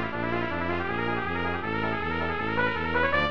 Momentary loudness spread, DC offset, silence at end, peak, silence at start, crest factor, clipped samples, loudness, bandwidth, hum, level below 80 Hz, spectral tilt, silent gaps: 4 LU; 1%; 0 s; -12 dBFS; 0 s; 16 dB; under 0.1%; -28 LUFS; 7.4 kHz; none; -46 dBFS; -7.5 dB/octave; none